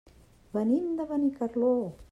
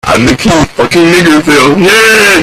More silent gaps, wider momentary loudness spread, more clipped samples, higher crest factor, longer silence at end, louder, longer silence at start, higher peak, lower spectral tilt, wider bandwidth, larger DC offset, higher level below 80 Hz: neither; about the same, 4 LU vs 5 LU; second, under 0.1% vs 1%; first, 14 dB vs 6 dB; about the same, 0.1 s vs 0 s; second, -29 LUFS vs -5 LUFS; first, 0.55 s vs 0.05 s; second, -16 dBFS vs 0 dBFS; first, -9 dB/octave vs -4 dB/octave; second, 10 kHz vs 17.5 kHz; neither; second, -60 dBFS vs -30 dBFS